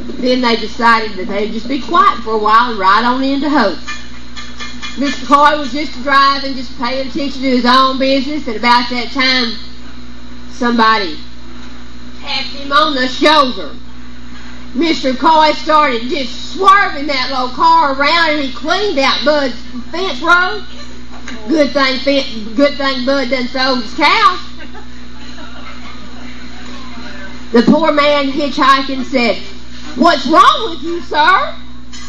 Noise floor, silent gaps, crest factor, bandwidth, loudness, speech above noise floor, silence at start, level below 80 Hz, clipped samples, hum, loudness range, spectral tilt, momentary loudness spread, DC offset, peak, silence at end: -33 dBFS; none; 14 dB; 12 kHz; -12 LUFS; 21 dB; 0 s; -40 dBFS; 0.3%; none; 4 LU; -4 dB/octave; 22 LU; 9%; 0 dBFS; 0 s